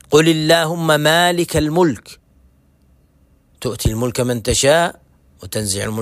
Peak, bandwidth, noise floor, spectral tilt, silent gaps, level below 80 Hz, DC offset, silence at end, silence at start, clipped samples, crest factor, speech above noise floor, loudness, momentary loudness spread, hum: 0 dBFS; 16 kHz; -54 dBFS; -4 dB/octave; none; -38 dBFS; under 0.1%; 0 s; 0.1 s; under 0.1%; 16 dB; 38 dB; -16 LUFS; 10 LU; none